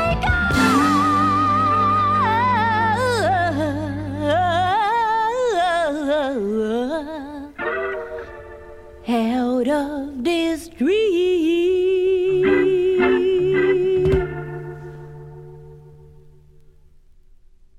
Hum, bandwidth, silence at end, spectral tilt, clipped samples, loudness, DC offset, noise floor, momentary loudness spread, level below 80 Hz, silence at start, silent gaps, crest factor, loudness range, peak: none; 14.5 kHz; 1.75 s; -6 dB/octave; under 0.1%; -19 LUFS; under 0.1%; -48 dBFS; 16 LU; -40 dBFS; 0 s; none; 14 dB; 8 LU; -6 dBFS